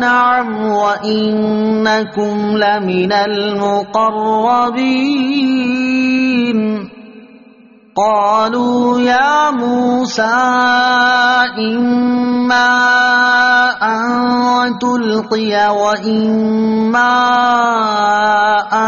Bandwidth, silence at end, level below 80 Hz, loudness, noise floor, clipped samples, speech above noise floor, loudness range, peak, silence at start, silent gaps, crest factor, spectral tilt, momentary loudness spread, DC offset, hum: 7.2 kHz; 0 s; -54 dBFS; -13 LUFS; -43 dBFS; under 0.1%; 31 dB; 4 LU; 0 dBFS; 0 s; none; 12 dB; -2 dB/octave; 5 LU; under 0.1%; none